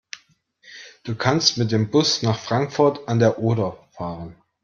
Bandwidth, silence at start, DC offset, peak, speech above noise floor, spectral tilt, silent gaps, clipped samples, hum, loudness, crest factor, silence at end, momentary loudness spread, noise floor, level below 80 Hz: 7.4 kHz; 0.15 s; under 0.1%; -2 dBFS; 38 dB; -5 dB/octave; none; under 0.1%; none; -20 LUFS; 20 dB; 0.3 s; 21 LU; -58 dBFS; -58 dBFS